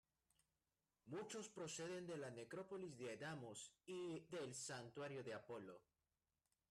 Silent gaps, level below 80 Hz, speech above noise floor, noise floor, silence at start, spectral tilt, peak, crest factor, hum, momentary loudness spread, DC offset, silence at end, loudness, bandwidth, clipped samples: none; -88 dBFS; over 37 dB; under -90 dBFS; 1.05 s; -4 dB/octave; -42 dBFS; 14 dB; none; 6 LU; under 0.1%; 0.9 s; -53 LUFS; 13 kHz; under 0.1%